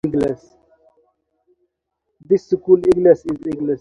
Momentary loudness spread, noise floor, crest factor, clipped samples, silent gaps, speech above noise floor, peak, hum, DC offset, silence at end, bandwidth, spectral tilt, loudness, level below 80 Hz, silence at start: 10 LU; -75 dBFS; 18 dB; under 0.1%; none; 59 dB; 0 dBFS; none; under 0.1%; 0.05 s; 8.8 kHz; -8.5 dB/octave; -17 LUFS; -50 dBFS; 0.05 s